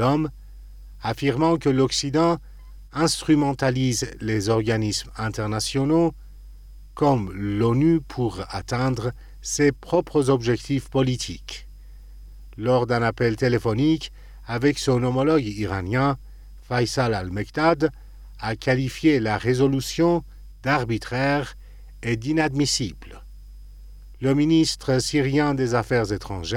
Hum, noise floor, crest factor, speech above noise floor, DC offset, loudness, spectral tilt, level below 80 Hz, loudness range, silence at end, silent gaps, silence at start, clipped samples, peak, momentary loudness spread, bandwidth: none; -42 dBFS; 16 dB; 21 dB; under 0.1%; -23 LUFS; -5.5 dB/octave; -42 dBFS; 2 LU; 0 s; none; 0 s; under 0.1%; -6 dBFS; 9 LU; 16 kHz